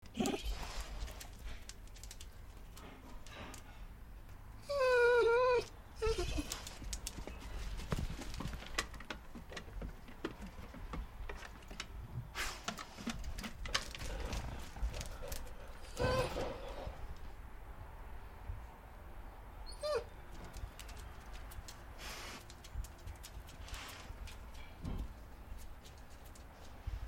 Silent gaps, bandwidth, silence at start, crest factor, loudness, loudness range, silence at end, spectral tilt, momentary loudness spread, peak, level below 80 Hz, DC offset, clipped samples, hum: none; 16.5 kHz; 0 s; 28 dB; -41 LUFS; 15 LU; 0 s; -4 dB/octave; 17 LU; -14 dBFS; -48 dBFS; under 0.1%; under 0.1%; none